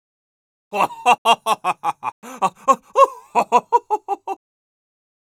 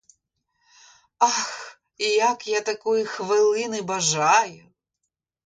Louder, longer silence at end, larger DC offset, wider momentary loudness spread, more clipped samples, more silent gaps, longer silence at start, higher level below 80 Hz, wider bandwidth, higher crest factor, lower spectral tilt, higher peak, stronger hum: first, -19 LUFS vs -22 LUFS; about the same, 1 s vs 0.9 s; neither; first, 13 LU vs 10 LU; neither; first, 1.18-1.25 s, 2.12-2.22 s vs none; second, 0.7 s vs 1.2 s; about the same, -74 dBFS vs -72 dBFS; first, 17 kHz vs 9.6 kHz; about the same, 20 dB vs 20 dB; about the same, -2.5 dB/octave vs -2 dB/octave; first, -2 dBFS vs -6 dBFS; neither